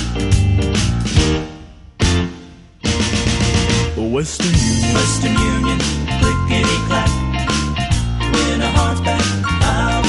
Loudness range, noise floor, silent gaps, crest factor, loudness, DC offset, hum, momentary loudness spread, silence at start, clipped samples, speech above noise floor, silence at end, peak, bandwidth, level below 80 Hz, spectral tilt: 2 LU; -38 dBFS; none; 16 dB; -17 LUFS; under 0.1%; none; 4 LU; 0 s; under 0.1%; 22 dB; 0 s; 0 dBFS; 11.5 kHz; -24 dBFS; -4.5 dB/octave